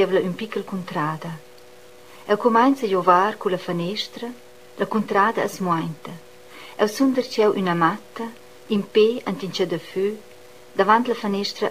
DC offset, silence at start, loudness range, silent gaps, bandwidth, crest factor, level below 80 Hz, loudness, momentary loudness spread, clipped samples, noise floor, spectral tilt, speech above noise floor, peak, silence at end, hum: 0.4%; 0 s; 3 LU; none; 15.5 kHz; 20 dB; -72 dBFS; -22 LUFS; 17 LU; under 0.1%; -47 dBFS; -5.5 dB/octave; 26 dB; -2 dBFS; 0 s; none